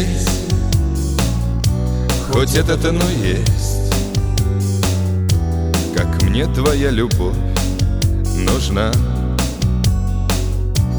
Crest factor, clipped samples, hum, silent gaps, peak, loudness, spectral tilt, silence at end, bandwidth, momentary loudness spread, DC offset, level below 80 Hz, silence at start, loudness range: 12 dB; under 0.1%; none; none; -4 dBFS; -17 LUFS; -5.5 dB/octave; 0 s; over 20 kHz; 3 LU; under 0.1%; -20 dBFS; 0 s; 1 LU